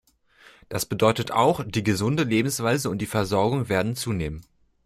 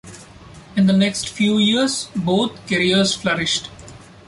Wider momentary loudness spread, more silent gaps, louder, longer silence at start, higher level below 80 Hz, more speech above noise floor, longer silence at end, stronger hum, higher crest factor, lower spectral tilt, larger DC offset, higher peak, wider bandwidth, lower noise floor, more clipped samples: about the same, 8 LU vs 7 LU; neither; second, -24 LUFS vs -18 LUFS; first, 0.7 s vs 0.05 s; about the same, -50 dBFS vs -52 dBFS; first, 32 dB vs 23 dB; first, 0.45 s vs 0.3 s; neither; about the same, 18 dB vs 14 dB; about the same, -5 dB/octave vs -4 dB/octave; neither; about the same, -6 dBFS vs -6 dBFS; first, 16 kHz vs 11.5 kHz; first, -55 dBFS vs -41 dBFS; neither